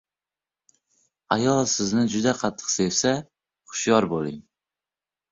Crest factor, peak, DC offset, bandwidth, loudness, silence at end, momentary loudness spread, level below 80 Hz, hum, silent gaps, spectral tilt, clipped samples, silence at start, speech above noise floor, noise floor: 22 dB; -4 dBFS; under 0.1%; 7.8 kHz; -23 LUFS; 0.9 s; 9 LU; -60 dBFS; none; none; -4 dB/octave; under 0.1%; 1.3 s; over 67 dB; under -90 dBFS